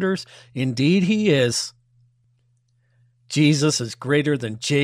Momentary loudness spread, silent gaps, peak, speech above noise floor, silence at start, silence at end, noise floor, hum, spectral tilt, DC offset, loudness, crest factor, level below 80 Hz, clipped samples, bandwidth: 9 LU; none; -6 dBFS; 44 dB; 0 s; 0 s; -64 dBFS; none; -5 dB/octave; under 0.1%; -21 LUFS; 16 dB; -62 dBFS; under 0.1%; 15 kHz